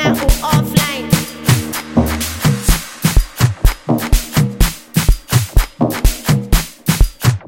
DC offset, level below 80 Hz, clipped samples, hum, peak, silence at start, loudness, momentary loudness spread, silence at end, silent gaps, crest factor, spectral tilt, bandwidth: 0.2%; -18 dBFS; under 0.1%; none; 0 dBFS; 0 s; -16 LUFS; 4 LU; 0.05 s; none; 14 dB; -5 dB/octave; 17 kHz